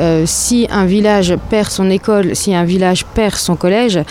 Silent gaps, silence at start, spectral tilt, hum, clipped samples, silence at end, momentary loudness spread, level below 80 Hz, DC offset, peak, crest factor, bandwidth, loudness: none; 0 s; -4.5 dB/octave; none; under 0.1%; 0 s; 3 LU; -32 dBFS; under 0.1%; -2 dBFS; 10 dB; 16.5 kHz; -13 LUFS